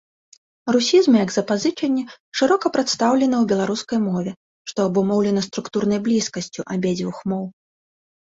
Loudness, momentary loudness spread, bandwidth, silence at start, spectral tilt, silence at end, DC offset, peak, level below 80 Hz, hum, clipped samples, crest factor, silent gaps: -20 LUFS; 11 LU; 8 kHz; 0.65 s; -5 dB/octave; 0.8 s; under 0.1%; -4 dBFS; -62 dBFS; none; under 0.1%; 16 dB; 2.20-2.32 s, 4.37-4.65 s